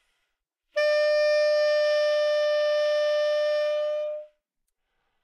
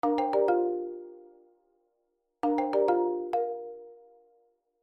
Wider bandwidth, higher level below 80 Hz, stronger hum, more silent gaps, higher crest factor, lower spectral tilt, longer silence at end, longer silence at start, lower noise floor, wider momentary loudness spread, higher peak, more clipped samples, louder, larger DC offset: first, 10 kHz vs 6.2 kHz; about the same, -74 dBFS vs -74 dBFS; neither; neither; second, 10 dB vs 16 dB; second, 2.5 dB/octave vs -7 dB/octave; about the same, 1 s vs 0.9 s; first, 0.75 s vs 0.05 s; about the same, -80 dBFS vs -78 dBFS; second, 8 LU vs 18 LU; about the same, -16 dBFS vs -14 dBFS; neither; first, -24 LUFS vs -29 LUFS; neither